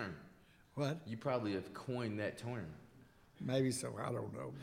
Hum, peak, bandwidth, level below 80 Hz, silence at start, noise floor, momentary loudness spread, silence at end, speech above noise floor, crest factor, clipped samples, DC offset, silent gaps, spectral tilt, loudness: none; -22 dBFS; 16.5 kHz; -72 dBFS; 0 s; -64 dBFS; 12 LU; 0 s; 24 dB; 18 dB; under 0.1%; under 0.1%; none; -5.5 dB/octave; -41 LUFS